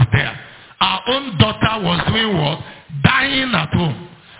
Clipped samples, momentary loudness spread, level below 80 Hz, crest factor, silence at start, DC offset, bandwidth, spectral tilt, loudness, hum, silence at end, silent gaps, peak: under 0.1%; 10 LU; -38 dBFS; 18 dB; 0 s; under 0.1%; 4 kHz; -9.5 dB/octave; -17 LUFS; none; 0.05 s; none; 0 dBFS